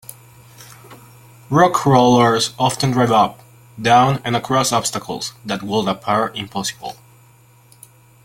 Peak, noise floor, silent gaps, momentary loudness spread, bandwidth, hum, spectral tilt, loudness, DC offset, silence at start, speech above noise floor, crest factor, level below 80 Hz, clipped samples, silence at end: 0 dBFS; -49 dBFS; none; 13 LU; 17 kHz; none; -4.5 dB/octave; -17 LUFS; under 0.1%; 0.1 s; 33 dB; 18 dB; -54 dBFS; under 0.1%; 1.3 s